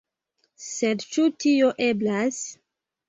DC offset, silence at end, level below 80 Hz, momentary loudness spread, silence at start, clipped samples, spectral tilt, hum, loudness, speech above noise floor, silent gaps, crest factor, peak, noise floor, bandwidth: under 0.1%; 0.55 s; -70 dBFS; 14 LU; 0.6 s; under 0.1%; -4 dB/octave; none; -23 LUFS; 50 dB; none; 16 dB; -10 dBFS; -73 dBFS; 8 kHz